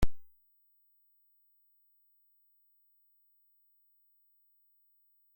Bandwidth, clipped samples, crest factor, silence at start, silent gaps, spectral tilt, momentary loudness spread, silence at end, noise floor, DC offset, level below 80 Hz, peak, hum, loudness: 16.5 kHz; under 0.1%; 24 dB; 0 s; none; -6 dB/octave; 0 LU; 5.15 s; -70 dBFS; under 0.1%; -48 dBFS; -14 dBFS; none; -57 LUFS